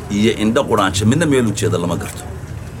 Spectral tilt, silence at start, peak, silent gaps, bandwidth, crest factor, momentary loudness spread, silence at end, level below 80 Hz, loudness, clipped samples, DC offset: -5.5 dB/octave; 0 s; 0 dBFS; none; 17 kHz; 16 dB; 15 LU; 0 s; -38 dBFS; -16 LUFS; under 0.1%; under 0.1%